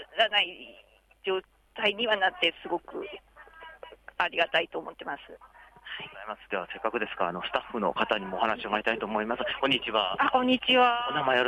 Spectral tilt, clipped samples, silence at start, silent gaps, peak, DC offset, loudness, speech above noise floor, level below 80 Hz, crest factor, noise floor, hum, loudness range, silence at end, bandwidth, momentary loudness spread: -4.5 dB/octave; under 0.1%; 0 s; none; -10 dBFS; under 0.1%; -28 LUFS; 21 dB; -62 dBFS; 20 dB; -49 dBFS; none; 7 LU; 0 s; 11.5 kHz; 19 LU